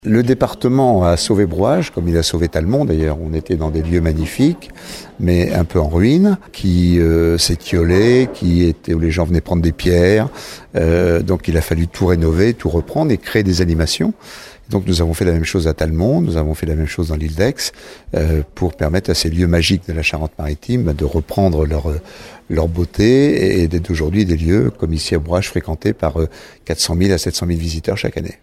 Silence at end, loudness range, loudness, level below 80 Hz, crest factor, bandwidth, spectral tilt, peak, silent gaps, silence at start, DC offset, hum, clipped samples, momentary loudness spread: 0.1 s; 4 LU; -16 LUFS; -26 dBFS; 16 dB; 15 kHz; -6 dB/octave; 0 dBFS; none; 0.05 s; under 0.1%; none; under 0.1%; 9 LU